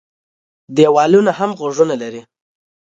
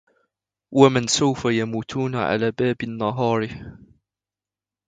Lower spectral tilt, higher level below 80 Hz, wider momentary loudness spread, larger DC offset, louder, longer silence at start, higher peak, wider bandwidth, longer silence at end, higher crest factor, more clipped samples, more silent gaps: about the same, -6 dB/octave vs -5 dB/octave; second, -64 dBFS vs -54 dBFS; first, 14 LU vs 10 LU; neither; first, -14 LUFS vs -21 LUFS; about the same, 0.7 s vs 0.7 s; about the same, 0 dBFS vs 0 dBFS; second, 7.8 kHz vs 9.4 kHz; second, 0.75 s vs 1.15 s; second, 16 dB vs 22 dB; neither; neither